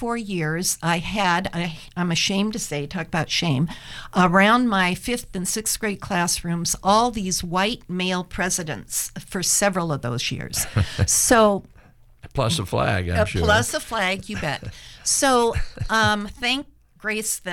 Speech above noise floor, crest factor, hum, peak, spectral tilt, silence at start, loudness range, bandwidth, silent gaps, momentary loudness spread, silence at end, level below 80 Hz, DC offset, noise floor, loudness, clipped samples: 28 dB; 18 dB; none; -6 dBFS; -3.5 dB/octave; 0 s; 3 LU; 19 kHz; none; 10 LU; 0 s; -40 dBFS; under 0.1%; -50 dBFS; -22 LUFS; under 0.1%